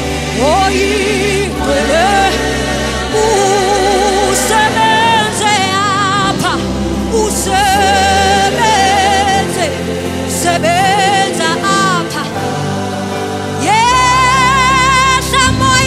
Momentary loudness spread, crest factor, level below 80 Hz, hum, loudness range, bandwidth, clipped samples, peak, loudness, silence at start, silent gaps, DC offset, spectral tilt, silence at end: 8 LU; 12 dB; -28 dBFS; none; 2 LU; 16 kHz; under 0.1%; 0 dBFS; -11 LUFS; 0 s; none; under 0.1%; -3.5 dB/octave; 0 s